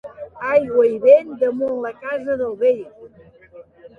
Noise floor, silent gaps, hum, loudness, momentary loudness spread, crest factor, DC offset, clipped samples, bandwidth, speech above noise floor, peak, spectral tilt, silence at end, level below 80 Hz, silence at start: -45 dBFS; none; none; -18 LUFS; 13 LU; 18 dB; under 0.1%; under 0.1%; 4.8 kHz; 27 dB; -2 dBFS; -7 dB/octave; 0.1 s; -60 dBFS; 0.05 s